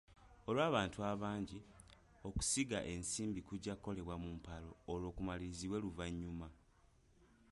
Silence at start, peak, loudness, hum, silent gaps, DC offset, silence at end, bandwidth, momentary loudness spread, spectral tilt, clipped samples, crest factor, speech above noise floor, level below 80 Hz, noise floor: 0.1 s; -22 dBFS; -43 LUFS; none; none; under 0.1%; 0.25 s; 11.5 kHz; 16 LU; -4.5 dB/octave; under 0.1%; 20 dB; 28 dB; -58 dBFS; -70 dBFS